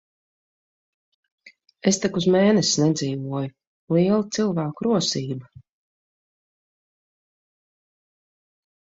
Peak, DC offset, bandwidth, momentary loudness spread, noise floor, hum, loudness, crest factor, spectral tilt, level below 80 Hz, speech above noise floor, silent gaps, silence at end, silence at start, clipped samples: -6 dBFS; under 0.1%; 8.2 kHz; 12 LU; under -90 dBFS; none; -22 LUFS; 20 dB; -5 dB/octave; -64 dBFS; over 69 dB; 3.67-3.88 s; 3.4 s; 1.45 s; under 0.1%